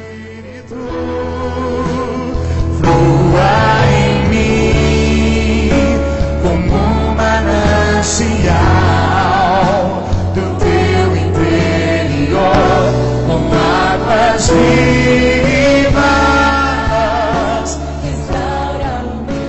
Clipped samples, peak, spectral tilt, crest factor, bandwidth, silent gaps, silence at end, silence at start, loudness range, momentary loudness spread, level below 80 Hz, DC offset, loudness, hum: under 0.1%; -2 dBFS; -6 dB/octave; 8 dB; 8.4 kHz; none; 0 s; 0 s; 3 LU; 9 LU; -22 dBFS; 0.5%; -12 LUFS; none